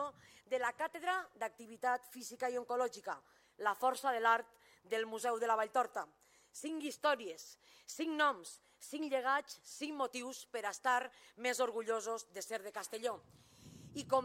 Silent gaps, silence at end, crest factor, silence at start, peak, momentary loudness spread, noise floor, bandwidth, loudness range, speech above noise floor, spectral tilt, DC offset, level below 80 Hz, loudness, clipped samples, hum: none; 0 s; 22 dB; 0 s; -18 dBFS; 15 LU; -58 dBFS; 16.5 kHz; 3 LU; 19 dB; -2 dB/octave; under 0.1%; -84 dBFS; -38 LUFS; under 0.1%; none